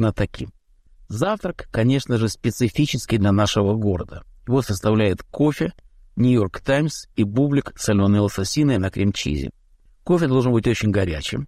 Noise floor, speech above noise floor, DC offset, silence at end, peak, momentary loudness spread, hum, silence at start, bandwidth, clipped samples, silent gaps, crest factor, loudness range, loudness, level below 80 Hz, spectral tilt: -51 dBFS; 31 dB; under 0.1%; 0 s; -8 dBFS; 9 LU; none; 0 s; 15 kHz; under 0.1%; none; 14 dB; 1 LU; -21 LUFS; -40 dBFS; -6 dB/octave